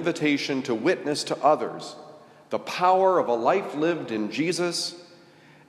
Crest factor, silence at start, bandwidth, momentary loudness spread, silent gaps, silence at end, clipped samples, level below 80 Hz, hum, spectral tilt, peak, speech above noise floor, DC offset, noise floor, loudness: 18 dB; 0 s; 13.5 kHz; 12 LU; none; 0.65 s; under 0.1%; -78 dBFS; none; -4.5 dB/octave; -6 dBFS; 28 dB; under 0.1%; -53 dBFS; -24 LUFS